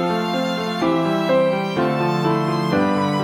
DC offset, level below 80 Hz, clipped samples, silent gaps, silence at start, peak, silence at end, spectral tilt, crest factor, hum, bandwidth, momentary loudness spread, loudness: under 0.1%; -56 dBFS; under 0.1%; none; 0 s; -6 dBFS; 0 s; -6.5 dB/octave; 14 dB; none; 19.5 kHz; 3 LU; -20 LUFS